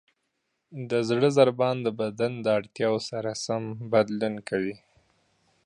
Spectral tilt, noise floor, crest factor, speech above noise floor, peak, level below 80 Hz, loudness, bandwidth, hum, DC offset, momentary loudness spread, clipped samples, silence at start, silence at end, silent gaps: -5.5 dB/octave; -78 dBFS; 20 dB; 52 dB; -6 dBFS; -70 dBFS; -26 LUFS; 11 kHz; none; under 0.1%; 10 LU; under 0.1%; 0.7 s; 0.9 s; none